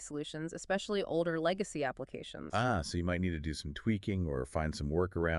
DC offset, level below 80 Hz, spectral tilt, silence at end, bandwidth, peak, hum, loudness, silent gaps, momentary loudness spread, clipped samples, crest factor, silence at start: under 0.1%; -52 dBFS; -5.5 dB/octave; 0 s; 11.5 kHz; -18 dBFS; none; -35 LUFS; none; 8 LU; under 0.1%; 18 dB; 0 s